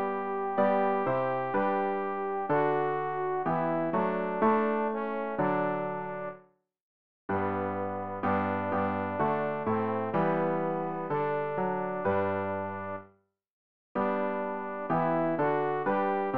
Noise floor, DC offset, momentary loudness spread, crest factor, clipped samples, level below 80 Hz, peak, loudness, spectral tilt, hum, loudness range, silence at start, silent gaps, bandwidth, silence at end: -64 dBFS; 0.3%; 7 LU; 16 dB; under 0.1%; -66 dBFS; -14 dBFS; -30 LUFS; -6.5 dB/octave; none; 4 LU; 0 s; 6.81-7.29 s, 13.50-13.95 s; 5.2 kHz; 0 s